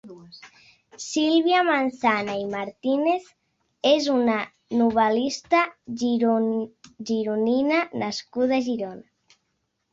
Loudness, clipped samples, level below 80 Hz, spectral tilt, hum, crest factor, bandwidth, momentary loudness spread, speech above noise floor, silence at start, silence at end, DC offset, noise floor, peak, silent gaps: -23 LUFS; under 0.1%; -66 dBFS; -4 dB/octave; none; 18 dB; 8 kHz; 10 LU; 52 dB; 0.05 s; 0.95 s; under 0.1%; -75 dBFS; -6 dBFS; none